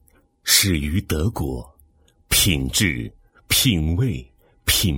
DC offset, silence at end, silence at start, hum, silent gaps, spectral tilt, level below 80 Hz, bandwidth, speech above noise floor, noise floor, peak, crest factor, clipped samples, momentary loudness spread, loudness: under 0.1%; 0 s; 0.45 s; none; none; -3 dB/octave; -34 dBFS; 19.5 kHz; 36 dB; -57 dBFS; -2 dBFS; 20 dB; under 0.1%; 14 LU; -19 LUFS